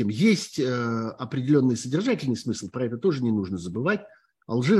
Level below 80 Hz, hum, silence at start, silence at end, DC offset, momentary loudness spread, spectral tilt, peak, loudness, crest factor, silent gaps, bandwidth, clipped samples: -64 dBFS; none; 0 s; 0 s; under 0.1%; 9 LU; -6 dB/octave; -8 dBFS; -26 LUFS; 16 dB; none; 12.5 kHz; under 0.1%